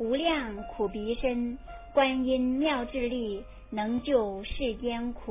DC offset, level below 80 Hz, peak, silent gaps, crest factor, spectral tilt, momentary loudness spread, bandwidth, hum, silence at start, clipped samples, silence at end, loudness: under 0.1%; -46 dBFS; -12 dBFS; none; 18 dB; -9 dB/octave; 10 LU; 3.8 kHz; none; 0 s; under 0.1%; 0 s; -30 LUFS